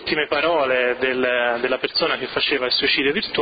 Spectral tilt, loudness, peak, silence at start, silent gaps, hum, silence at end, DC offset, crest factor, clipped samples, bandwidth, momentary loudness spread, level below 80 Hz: -7 dB/octave; -19 LUFS; -6 dBFS; 0 s; none; none; 0 s; under 0.1%; 14 dB; under 0.1%; 5.2 kHz; 3 LU; -54 dBFS